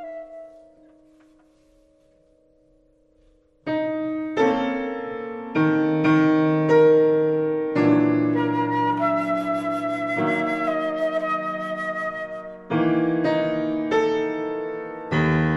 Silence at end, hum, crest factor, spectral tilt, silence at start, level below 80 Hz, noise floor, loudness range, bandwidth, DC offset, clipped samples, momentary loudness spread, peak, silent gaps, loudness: 0 s; none; 16 dB; -8 dB/octave; 0 s; -54 dBFS; -59 dBFS; 8 LU; 7.6 kHz; under 0.1%; under 0.1%; 12 LU; -6 dBFS; none; -22 LUFS